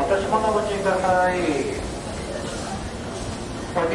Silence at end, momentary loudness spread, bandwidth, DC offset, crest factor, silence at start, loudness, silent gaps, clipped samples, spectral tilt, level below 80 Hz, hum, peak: 0 s; 11 LU; 11.5 kHz; under 0.1%; 16 dB; 0 s; -24 LUFS; none; under 0.1%; -5 dB/octave; -40 dBFS; none; -8 dBFS